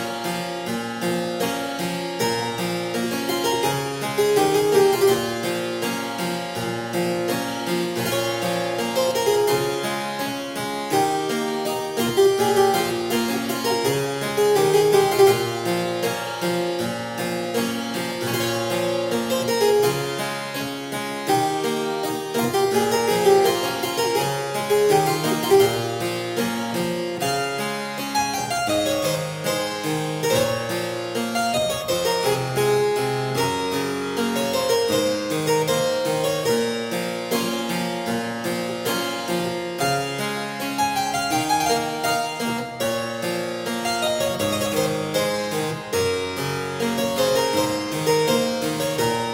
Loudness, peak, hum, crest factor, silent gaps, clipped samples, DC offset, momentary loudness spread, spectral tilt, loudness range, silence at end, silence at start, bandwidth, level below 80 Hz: -22 LUFS; -4 dBFS; none; 18 dB; none; under 0.1%; under 0.1%; 8 LU; -4 dB/octave; 4 LU; 0 s; 0 s; 16.5 kHz; -58 dBFS